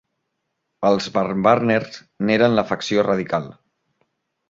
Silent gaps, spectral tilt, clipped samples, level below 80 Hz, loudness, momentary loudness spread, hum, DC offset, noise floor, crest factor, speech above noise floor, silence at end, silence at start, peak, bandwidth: none; -6 dB/octave; under 0.1%; -58 dBFS; -19 LUFS; 9 LU; none; under 0.1%; -76 dBFS; 20 dB; 57 dB; 0.95 s; 0.8 s; 0 dBFS; 7.8 kHz